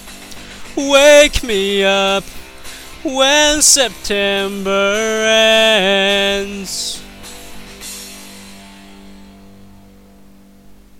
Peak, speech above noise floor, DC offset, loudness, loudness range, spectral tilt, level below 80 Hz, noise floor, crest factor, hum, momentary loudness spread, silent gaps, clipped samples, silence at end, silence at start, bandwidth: 0 dBFS; 31 dB; under 0.1%; -12 LUFS; 16 LU; -1.5 dB/octave; -38 dBFS; -44 dBFS; 16 dB; none; 24 LU; none; under 0.1%; 0.25 s; 0 s; 17 kHz